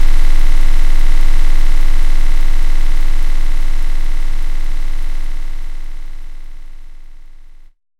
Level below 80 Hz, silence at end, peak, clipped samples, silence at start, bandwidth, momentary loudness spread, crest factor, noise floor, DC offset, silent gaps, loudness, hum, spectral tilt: -10 dBFS; 0.85 s; 0 dBFS; under 0.1%; 0 s; 5.8 kHz; 17 LU; 8 dB; -34 dBFS; under 0.1%; none; -21 LUFS; none; -4.5 dB/octave